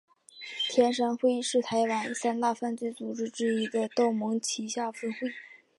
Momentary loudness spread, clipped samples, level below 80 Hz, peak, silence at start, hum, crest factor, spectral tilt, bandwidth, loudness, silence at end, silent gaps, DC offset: 9 LU; under 0.1%; -78 dBFS; -10 dBFS; 0.35 s; none; 20 dB; -3.5 dB/octave; 11.5 kHz; -29 LUFS; 0.25 s; none; under 0.1%